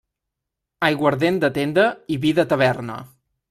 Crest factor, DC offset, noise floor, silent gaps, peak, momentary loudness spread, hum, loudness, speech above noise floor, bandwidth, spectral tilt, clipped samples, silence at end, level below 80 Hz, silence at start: 18 dB; under 0.1%; -82 dBFS; none; -2 dBFS; 8 LU; none; -20 LUFS; 63 dB; 14.5 kHz; -6.5 dB/octave; under 0.1%; 0.45 s; -58 dBFS; 0.8 s